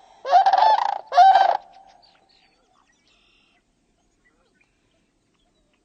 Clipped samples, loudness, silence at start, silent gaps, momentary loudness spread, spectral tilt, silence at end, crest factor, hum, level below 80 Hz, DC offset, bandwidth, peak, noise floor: under 0.1%; -17 LUFS; 0.25 s; none; 8 LU; -0.5 dB/octave; 4.25 s; 18 dB; none; -74 dBFS; under 0.1%; 7 kHz; -4 dBFS; -66 dBFS